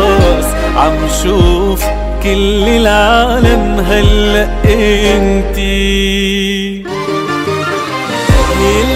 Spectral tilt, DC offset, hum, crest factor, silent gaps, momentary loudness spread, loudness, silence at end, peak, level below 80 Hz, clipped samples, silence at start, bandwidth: -5 dB/octave; under 0.1%; none; 10 dB; none; 7 LU; -11 LUFS; 0 s; 0 dBFS; -16 dBFS; 0.2%; 0 s; 16 kHz